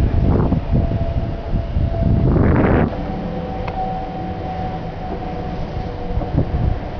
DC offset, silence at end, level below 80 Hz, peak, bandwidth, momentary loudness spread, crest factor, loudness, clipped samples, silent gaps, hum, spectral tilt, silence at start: under 0.1%; 0 s; -24 dBFS; -4 dBFS; 5.4 kHz; 11 LU; 14 dB; -20 LUFS; under 0.1%; none; none; -10 dB/octave; 0 s